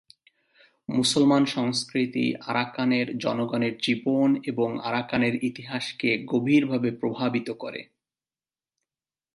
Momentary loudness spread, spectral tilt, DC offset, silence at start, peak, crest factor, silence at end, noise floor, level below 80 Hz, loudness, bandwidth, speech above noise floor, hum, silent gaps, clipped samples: 9 LU; -5 dB/octave; under 0.1%; 0.9 s; -8 dBFS; 18 dB; 1.5 s; under -90 dBFS; -68 dBFS; -25 LUFS; 11.5 kHz; over 65 dB; none; none; under 0.1%